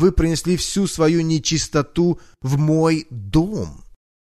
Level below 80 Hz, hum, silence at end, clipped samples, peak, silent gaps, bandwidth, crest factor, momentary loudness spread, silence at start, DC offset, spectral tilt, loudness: -32 dBFS; none; 0.55 s; under 0.1%; -4 dBFS; none; 13.5 kHz; 16 dB; 7 LU; 0 s; under 0.1%; -5.5 dB/octave; -19 LUFS